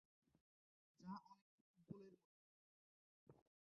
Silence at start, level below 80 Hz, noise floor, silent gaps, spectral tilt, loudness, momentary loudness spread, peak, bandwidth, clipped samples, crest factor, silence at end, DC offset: 0.35 s; under -90 dBFS; under -90 dBFS; 0.41-0.95 s, 1.41-1.74 s, 2.24-3.27 s; -7.5 dB/octave; -60 LUFS; 6 LU; -44 dBFS; 6.4 kHz; under 0.1%; 22 dB; 0.35 s; under 0.1%